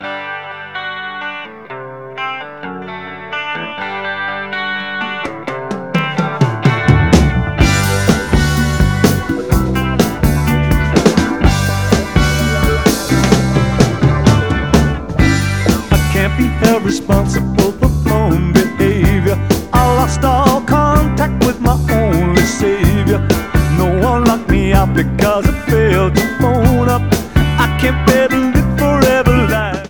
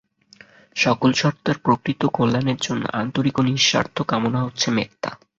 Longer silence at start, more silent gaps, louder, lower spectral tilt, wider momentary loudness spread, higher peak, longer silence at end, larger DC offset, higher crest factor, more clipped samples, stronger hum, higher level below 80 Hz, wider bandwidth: second, 0 s vs 0.75 s; neither; first, -13 LUFS vs -21 LUFS; first, -6 dB/octave vs -4.5 dB/octave; first, 11 LU vs 7 LU; about the same, 0 dBFS vs -2 dBFS; second, 0 s vs 0.25 s; first, 0.9% vs under 0.1%; second, 12 dB vs 18 dB; first, 0.4% vs under 0.1%; neither; first, -22 dBFS vs -56 dBFS; first, over 20 kHz vs 7.8 kHz